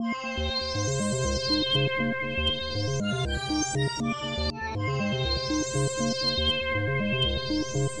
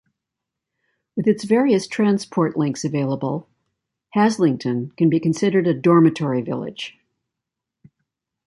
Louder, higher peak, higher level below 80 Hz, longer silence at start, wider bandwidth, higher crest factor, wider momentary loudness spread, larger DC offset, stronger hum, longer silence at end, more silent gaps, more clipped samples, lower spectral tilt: second, -27 LUFS vs -20 LUFS; second, -14 dBFS vs -4 dBFS; first, -40 dBFS vs -66 dBFS; second, 0 s vs 1.15 s; about the same, 11 kHz vs 11.5 kHz; about the same, 14 dB vs 18 dB; second, 5 LU vs 11 LU; first, 0.3% vs under 0.1%; neither; second, 0 s vs 1.55 s; neither; neither; second, -4 dB/octave vs -7 dB/octave